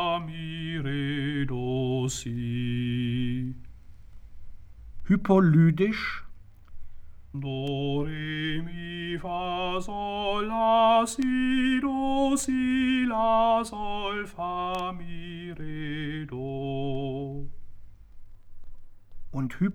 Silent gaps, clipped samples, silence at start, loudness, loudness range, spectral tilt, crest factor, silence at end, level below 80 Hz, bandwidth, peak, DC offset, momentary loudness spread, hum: none; under 0.1%; 0 s; -27 LUFS; 10 LU; -6 dB/octave; 18 dB; 0 s; -46 dBFS; 16.5 kHz; -10 dBFS; under 0.1%; 15 LU; none